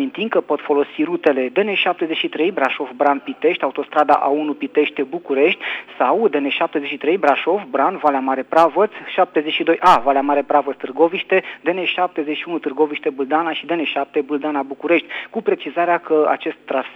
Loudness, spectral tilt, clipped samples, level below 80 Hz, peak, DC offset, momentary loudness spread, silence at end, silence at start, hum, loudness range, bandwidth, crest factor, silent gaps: -18 LUFS; -5.5 dB/octave; under 0.1%; -64 dBFS; -2 dBFS; under 0.1%; 7 LU; 0 s; 0 s; none; 4 LU; 9.8 kHz; 16 dB; none